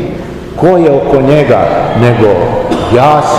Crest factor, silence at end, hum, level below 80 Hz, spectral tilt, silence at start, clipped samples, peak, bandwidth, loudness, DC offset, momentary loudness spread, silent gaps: 8 dB; 0 s; none; -30 dBFS; -7 dB/octave; 0 s; 4%; 0 dBFS; 13 kHz; -8 LUFS; under 0.1%; 6 LU; none